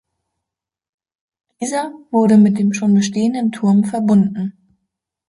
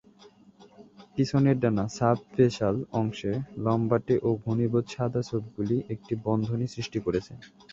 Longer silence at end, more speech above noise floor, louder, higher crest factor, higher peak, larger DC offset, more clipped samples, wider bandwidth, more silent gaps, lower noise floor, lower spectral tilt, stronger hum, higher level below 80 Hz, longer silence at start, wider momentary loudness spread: first, 0.75 s vs 0.25 s; first, 69 dB vs 28 dB; first, -16 LUFS vs -28 LUFS; second, 14 dB vs 20 dB; first, -2 dBFS vs -8 dBFS; neither; neither; first, 11.5 kHz vs 7.8 kHz; neither; first, -84 dBFS vs -55 dBFS; about the same, -6.5 dB/octave vs -7.5 dB/octave; neither; second, -62 dBFS vs -56 dBFS; first, 1.6 s vs 0.6 s; first, 12 LU vs 8 LU